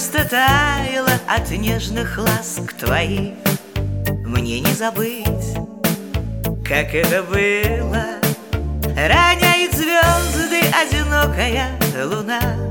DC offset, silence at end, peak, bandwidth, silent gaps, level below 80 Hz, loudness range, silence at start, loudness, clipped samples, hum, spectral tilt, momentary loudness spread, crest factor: 0.1%; 0 s; 0 dBFS; over 20 kHz; none; -28 dBFS; 6 LU; 0 s; -18 LUFS; under 0.1%; none; -4 dB/octave; 9 LU; 18 dB